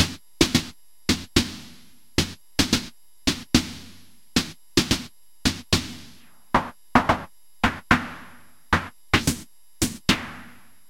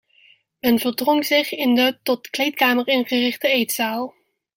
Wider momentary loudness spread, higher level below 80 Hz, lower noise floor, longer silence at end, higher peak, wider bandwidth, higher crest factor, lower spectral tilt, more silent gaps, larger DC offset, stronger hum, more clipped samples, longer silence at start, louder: first, 17 LU vs 7 LU; first, -40 dBFS vs -64 dBFS; about the same, -52 dBFS vs -55 dBFS; about the same, 0.4 s vs 0.45 s; about the same, 0 dBFS vs -2 dBFS; about the same, 16.5 kHz vs 17 kHz; first, 26 dB vs 18 dB; about the same, -3.5 dB/octave vs -2.5 dB/octave; neither; first, 0.5% vs under 0.1%; neither; neither; second, 0 s vs 0.65 s; second, -24 LUFS vs -19 LUFS